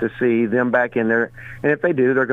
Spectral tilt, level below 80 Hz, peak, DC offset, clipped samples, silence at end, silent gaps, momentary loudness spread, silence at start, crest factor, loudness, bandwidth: -9 dB/octave; -52 dBFS; -6 dBFS; under 0.1%; under 0.1%; 0 s; none; 4 LU; 0 s; 14 dB; -19 LUFS; 6.4 kHz